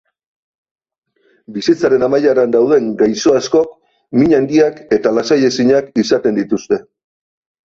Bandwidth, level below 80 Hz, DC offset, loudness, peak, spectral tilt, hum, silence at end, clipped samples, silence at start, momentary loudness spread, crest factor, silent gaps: 7.8 kHz; -52 dBFS; under 0.1%; -14 LUFS; -2 dBFS; -5.5 dB/octave; none; 0.85 s; under 0.1%; 1.5 s; 7 LU; 14 dB; none